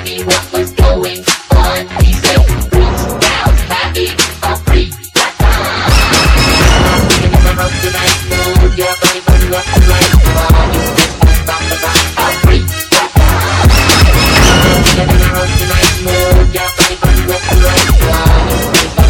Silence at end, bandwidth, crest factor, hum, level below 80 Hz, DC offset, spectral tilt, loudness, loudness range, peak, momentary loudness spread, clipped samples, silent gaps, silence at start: 0 s; 19 kHz; 8 dB; none; -12 dBFS; under 0.1%; -4 dB/octave; -10 LUFS; 3 LU; 0 dBFS; 6 LU; 0.7%; none; 0 s